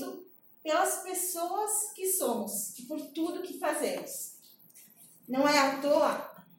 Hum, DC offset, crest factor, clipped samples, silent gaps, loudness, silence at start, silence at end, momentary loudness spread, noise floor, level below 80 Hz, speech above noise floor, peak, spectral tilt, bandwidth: none; under 0.1%; 20 dB; under 0.1%; none; -30 LUFS; 0 s; 0.15 s; 13 LU; -57 dBFS; -88 dBFS; 26 dB; -12 dBFS; -2 dB/octave; 17 kHz